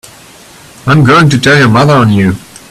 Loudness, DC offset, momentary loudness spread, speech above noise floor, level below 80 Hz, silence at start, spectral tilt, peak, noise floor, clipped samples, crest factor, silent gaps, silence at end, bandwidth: -6 LUFS; under 0.1%; 9 LU; 29 dB; -38 dBFS; 0.85 s; -6 dB/octave; 0 dBFS; -35 dBFS; 0.2%; 8 dB; none; 0.3 s; 14 kHz